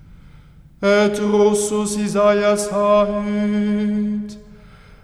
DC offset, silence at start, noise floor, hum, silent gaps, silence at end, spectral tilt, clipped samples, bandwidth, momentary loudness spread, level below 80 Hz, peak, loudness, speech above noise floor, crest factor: under 0.1%; 0.25 s; -45 dBFS; none; none; 0.45 s; -5 dB/octave; under 0.1%; 14 kHz; 7 LU; -46 dBFS; -4 dBFS; -18 LUFS; 28 dB; 14 dB